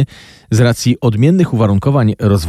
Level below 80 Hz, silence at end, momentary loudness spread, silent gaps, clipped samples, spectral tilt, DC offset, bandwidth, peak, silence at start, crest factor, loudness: -40 dBFS; 0 s; 3 LU; none; under 0.1%; -7 dB/octave; under 0.1%; 14 kHz; -2 dBFS; 0 s; 10 dB; -13 LUFS